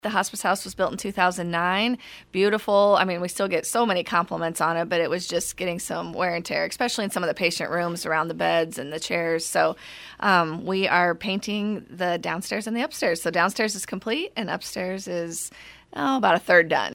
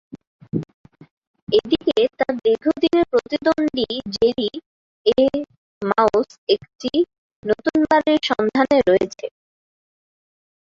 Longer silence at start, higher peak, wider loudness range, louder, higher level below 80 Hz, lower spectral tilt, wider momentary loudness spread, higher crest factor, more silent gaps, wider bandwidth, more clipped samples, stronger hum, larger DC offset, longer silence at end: about the same, 0.05 s vs 0.15 s; about the same, -4 dBFS vs -2 dBFS; about the same, 3 LU vs 2 LU; second, -24 LUFS vs -20 LUFS; second, -60 dBFS vs -54 dBFS; second, -3.5 dB/octave vs -5.5 dB/octave; second, 9 LU vs 12 LU; about the same, 20 dB vs 18 dB; second, none vs 0.27-0.39 s, 0.74-0.84 s, 1.11-1.34 s, 1.42-1.47 s, 4.66-5.05 s, 5.58-5.81 s, 6.38-6.47 s, 7.18-7.43 s; first, 18 kHz vs 7.6 kHz; neither; neither; neither; second, 0 s vs 1.3 s